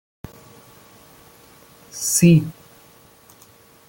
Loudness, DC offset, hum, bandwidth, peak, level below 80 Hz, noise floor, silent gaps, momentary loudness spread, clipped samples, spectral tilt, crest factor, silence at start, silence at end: -16 LUFS; under 0.1%; none; 17 kHz; -4 dBFS; -54 dBFS; -50 dBFS; none; 28 LU; under 0.1%; -5 dB/octave; 20 dB; 1.95 s; 1.35 s